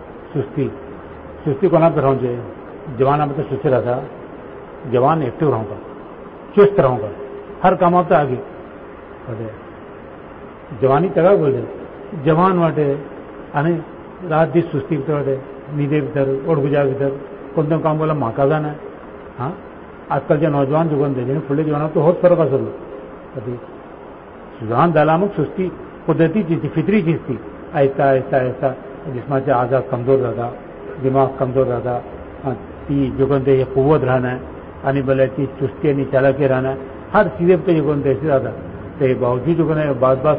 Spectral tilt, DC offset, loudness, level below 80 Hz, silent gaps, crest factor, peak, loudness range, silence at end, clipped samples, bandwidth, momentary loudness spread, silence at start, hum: -13 dB/octave; under 0.1%; -18 LUFS; -46 dBFS; none; 14 dB; -2 dBFS; 3 LU; 0 s; under 0.1%; 4.9 kHz; 20 LU; 0 s; none